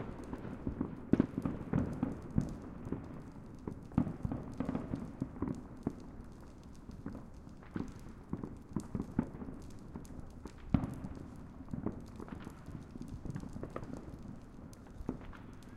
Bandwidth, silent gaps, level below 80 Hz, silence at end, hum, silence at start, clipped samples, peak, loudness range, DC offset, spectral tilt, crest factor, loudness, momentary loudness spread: 13 kHz; none; -52 dBFS; 0 s; none; 0 s; under 0.1%; -12 dBFS; 8 LU; under 0.1%; -8.5 dB/octave; 30 dB; -42 LUFS; 15 LU